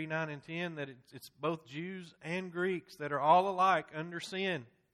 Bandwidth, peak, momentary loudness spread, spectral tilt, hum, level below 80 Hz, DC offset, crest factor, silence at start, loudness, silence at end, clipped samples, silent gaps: 13.5 kHz; -14 dBFS; 17 LU; -5.5 dB/octave; none; -78 dBFS; under 0.1%; 22 dB; 0 s; -34 LUFS; 0.3 s; under 0.1%; none